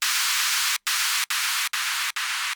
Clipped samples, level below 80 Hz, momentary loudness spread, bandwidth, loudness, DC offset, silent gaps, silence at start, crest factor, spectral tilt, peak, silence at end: under 0.1%; -86 dBFS; 4 LU; over 20 kHz; -22 LUFS; under 0.1%; none; 0 s; 14 dB; 9 dB/octave; -10 dBFS; 0 s